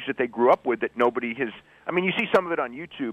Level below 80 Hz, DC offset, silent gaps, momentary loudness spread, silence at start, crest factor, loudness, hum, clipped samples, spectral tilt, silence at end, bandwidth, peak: -66 dBFS; under 0.1%; none; 11 LU; 0 s; 18 dB; -25 LUFS; none; under 0.1%; -6.5 dB/octave; 0 s; 9.2 kHz; -8 dBFS